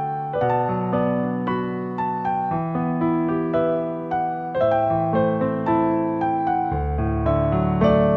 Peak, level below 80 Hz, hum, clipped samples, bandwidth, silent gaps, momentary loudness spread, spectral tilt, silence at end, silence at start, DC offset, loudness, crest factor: -6 dBFS; -36 dBFS; none; under 0.1%; 6 kHz; none; 5 LU; -10.5 dB/octave; 0 s; 0 s; under 0.1%; -22 LUFS; 16 dB